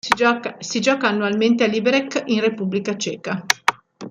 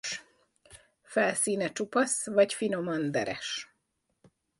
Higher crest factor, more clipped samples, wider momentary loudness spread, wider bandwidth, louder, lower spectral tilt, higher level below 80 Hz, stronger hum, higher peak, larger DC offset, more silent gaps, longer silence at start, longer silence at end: about the same, 20 dB vs 20 dB; neither; second, 8 LU vs 11 LU; first, 16 kHz vs 12 kHz; first, -20 LUFS vs -29 LUFS; about the same, -4 dB/octave vs -3 dB/octave; first, -62 dBFS vs -72 dBFS; neither; first, 0 dBFS vs -10 dBFS; neither; neither; about the same, 0.05 s vs 0.05 s; second, 0 s vs 0.95 s